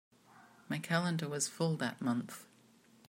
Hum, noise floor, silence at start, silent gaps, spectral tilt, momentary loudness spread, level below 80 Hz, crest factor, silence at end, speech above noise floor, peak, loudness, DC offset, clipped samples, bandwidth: none; -65 dBFS; 0.35 s; none; -4.5 dB/octave; 9 LU; -82 dBFS; 22 dB; 0.65 s; 29 dB; -16 dBFS; -36 LUFS; under 0.1%; under 0.1%; 16 kHz